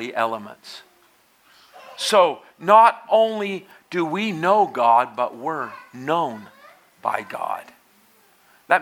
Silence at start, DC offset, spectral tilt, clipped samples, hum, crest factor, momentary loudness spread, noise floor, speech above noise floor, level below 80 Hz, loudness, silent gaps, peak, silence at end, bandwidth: 0 s; under 0.1%; -4 dB/octave; under 0.1%; none; 22 dB; 18 LU; -58 dBFS; 38 dB; -78 dBFS; -20 LUFS; none; 0 dBFS; 0 s; 16.5 kHz